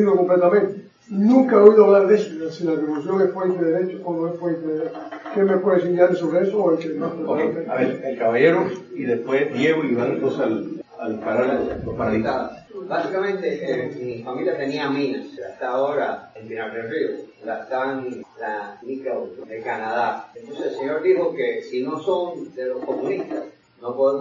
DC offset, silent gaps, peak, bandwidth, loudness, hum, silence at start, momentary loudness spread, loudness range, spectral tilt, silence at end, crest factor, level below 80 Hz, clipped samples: under 0.1%; none; 0 dBFS; 7.4 kHz; -21 LUFS; none; 0 s; 14 LU; 10 LU; -7.5 dB/octave; 0 s; 20 dB; -58 dBFS; under 0.1%